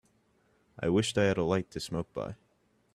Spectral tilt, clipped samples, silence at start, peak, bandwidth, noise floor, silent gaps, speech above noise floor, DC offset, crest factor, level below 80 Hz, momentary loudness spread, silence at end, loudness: -5.5 dB/octave; under 0.1%; 0.8 s; -14 dBFS; 14 kHz; -71 dBFS; none; 41 dB; under 0.1%; 20 dB; -60 dBFS; 13 LU; 0.6 s; -31 LUFS